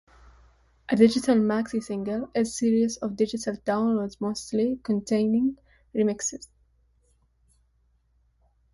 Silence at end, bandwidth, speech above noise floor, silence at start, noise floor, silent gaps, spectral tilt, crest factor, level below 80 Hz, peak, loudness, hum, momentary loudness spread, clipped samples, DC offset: 2.3 s; 11.5 kHz; 42 dB; 0.9 s; -67 dBFS; none; -5 dB/octave; 20 dB; -60 dBFS; -6 dBFS; -26 LUFS; none; 10 LU; under 0.1%; under 0.1%